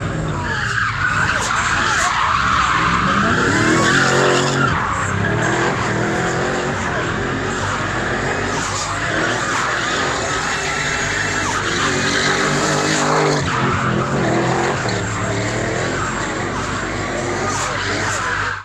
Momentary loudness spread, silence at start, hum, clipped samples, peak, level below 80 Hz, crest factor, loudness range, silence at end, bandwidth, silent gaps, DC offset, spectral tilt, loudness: 6 LU; 0 s; none; under 0.1%; -2 dBFS; -38 dBFS; 16 dB; 5 LU; 0 s; 14 kHz; none; under 0.1%; -4 dB/octave; -17 LUFS